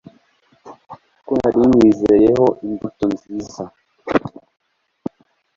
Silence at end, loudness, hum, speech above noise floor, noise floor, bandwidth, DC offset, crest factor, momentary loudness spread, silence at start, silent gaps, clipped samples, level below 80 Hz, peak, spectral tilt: 1.3 s; -16 LUFS; none; 42 dB; -57 dBFS; 7.6 kHz; under 0.1%; 16 dB; 20 LU; 0.65 s; none; under 0.1%; -48 dBFS; -2 dBFS; -7.5 dB/octave